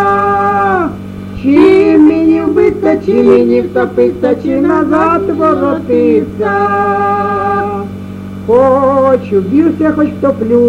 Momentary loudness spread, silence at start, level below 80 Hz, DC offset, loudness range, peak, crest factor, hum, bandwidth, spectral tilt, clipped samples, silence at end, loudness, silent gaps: 8 LU; 0 s; -40 dBFS; under 0.1%; 3 LU; 0 dBFS; 10 dB; none; 8.6 kHz; -8.5 dB/octave; under 0.1%; 0 s; -10 LUFS; none